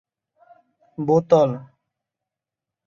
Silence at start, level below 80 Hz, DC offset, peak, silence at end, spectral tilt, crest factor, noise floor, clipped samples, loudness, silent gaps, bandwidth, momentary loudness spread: 1 s; -66 dBFS; under 0.1%; -2 dBFS; 1.2 s; -8.5 dB/octave; 22 dB; -87 dBFS; under 0.1%; -19 LUFS; none; 7.2 kHz; 19 LU